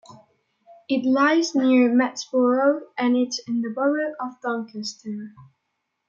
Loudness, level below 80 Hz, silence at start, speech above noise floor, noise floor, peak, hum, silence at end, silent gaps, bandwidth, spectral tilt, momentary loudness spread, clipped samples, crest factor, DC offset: -22 LUFS; -78 dBFS; 0.1 s; 55 dB; -77 dBFS; -8 dBFS; none; 0.65 s; none; 7.6 kHz; -4 dB/octave; 14 LU; under 0.1%; 16 dB; under 0.1%